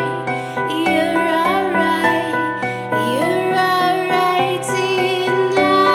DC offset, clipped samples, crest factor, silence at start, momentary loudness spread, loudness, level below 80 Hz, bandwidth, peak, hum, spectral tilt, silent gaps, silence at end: under 0.1%; under 0.1%; 16 dB; 0 s; 6 LU; -17 LUFS; -62 dBFS; 16.5 kHz; -2 dBFS; none; -4.5 dB/octave; none; 0 s